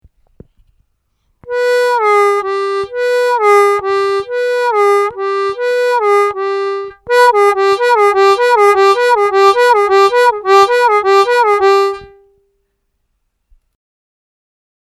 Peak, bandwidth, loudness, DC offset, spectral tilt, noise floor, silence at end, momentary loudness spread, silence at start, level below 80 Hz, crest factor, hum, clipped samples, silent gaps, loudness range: 0 dBFS; 13.5 kHz; -11 LUFS; under 0.1%; -2.5 dB/octave; -66 dBFS; 2.85 s; 8 LU; 1.45 s; -54 dBFS; 12 dB; none; under 0.1%; none; 6 LU